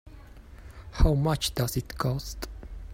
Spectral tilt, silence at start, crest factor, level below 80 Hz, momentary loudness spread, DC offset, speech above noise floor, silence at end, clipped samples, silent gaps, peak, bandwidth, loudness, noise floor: -5.5 dB/octave; 0.05 s; 20 dB; -34 dBFS; 22 LU; under 0.1%; 21 dB; 0 s; under 0.1%; none; -10 dBFS; 16 kHz; -28 LUFS; -47 dBFS